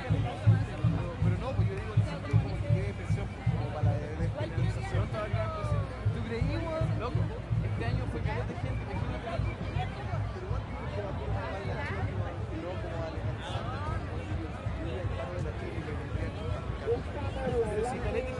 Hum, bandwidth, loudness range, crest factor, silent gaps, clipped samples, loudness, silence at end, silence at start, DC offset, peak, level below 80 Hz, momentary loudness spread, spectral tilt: none; 10.5 kHz; 5 LU; 18 dB; none; under 0.1%; -33 LUFS; 0 s; 0 s; under 0.1%; -12 dBFS; -40 dBFS; 6 LU; -7.5 dB/octave